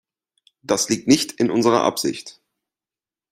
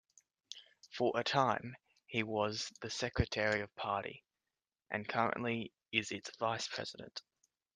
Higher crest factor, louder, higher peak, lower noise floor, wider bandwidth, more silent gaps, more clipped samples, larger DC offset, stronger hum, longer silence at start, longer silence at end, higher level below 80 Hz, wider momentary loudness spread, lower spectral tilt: about the same, 20 dB vs 24 dB; first, -19 LUFS vs -37 LUFS; first, -2 dBFS vs -16 dBFS; about the same, under -90 dBFS vs under -90 dBFS; first, 16 kHz vs 10 kHz; neither; neither; neither; neither; first, 0.7 s vs 0.5 s; first, 1 s vs 0.55 s; about the same, -62 dBFS vs -58 dBFS; about the same, 18 LU vs 17 LU; about the same, -3.5 dB/octave vs -4 dB/octave